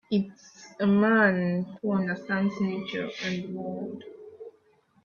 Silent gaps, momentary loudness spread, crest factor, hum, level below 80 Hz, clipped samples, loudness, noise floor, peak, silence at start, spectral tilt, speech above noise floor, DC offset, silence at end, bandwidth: none; 24 LU; 18 dB; none; -68 dBFS; under 0.1%; -27 LUFS; -64 dBFS; -10 dBFS; 0.1 s; -7 dB/octave; 37 dB; under 0.1%; 0.55 s; 7 kHz